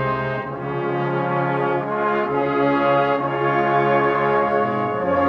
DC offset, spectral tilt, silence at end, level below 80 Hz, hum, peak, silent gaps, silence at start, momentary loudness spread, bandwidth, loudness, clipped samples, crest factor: under 0.1%; -8.5 dB/octave; 0 s; -54 dBFS; none; -6 dBFS; none; 0 s; 6 LU; 6.6 kHz; -20 LUFS; under 0.1%; 14 dB